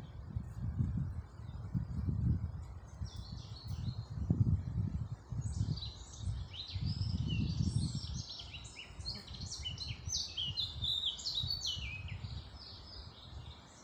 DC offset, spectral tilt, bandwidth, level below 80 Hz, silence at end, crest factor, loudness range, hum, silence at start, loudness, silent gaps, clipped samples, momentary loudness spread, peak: under 0.1%; -4.5 dB/octave; 13.5 kHz; -48 dBFS; 0 s; 22 dB; 3 LU; none; 0 s; -39 LUFS; none; under 0.1%; 14 LU; -18 dBFS